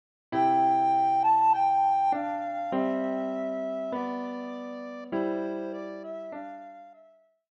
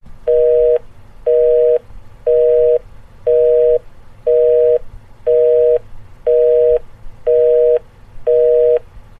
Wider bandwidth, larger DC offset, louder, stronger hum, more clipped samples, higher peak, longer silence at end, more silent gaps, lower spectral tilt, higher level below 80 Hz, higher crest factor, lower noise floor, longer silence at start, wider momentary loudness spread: first, 7.4 kHz vs 3.5 kHz; neither; second, -27 LUFS vs -14 LUFS; neither; neither; second, -14 dBFS vs -4 dBFS; first, 0.6 s vs 0.2 s; neither; about the same, -7 dB/octave vs -7 dB/octave; second, -78 dBFS vs -38 dBFS; about the same, 14 dB vs 10 dB; first, -59 dBFS vs -34 dBFS; first, 0.3 s vs 0.05 s; first, 16 LU vs 8 LU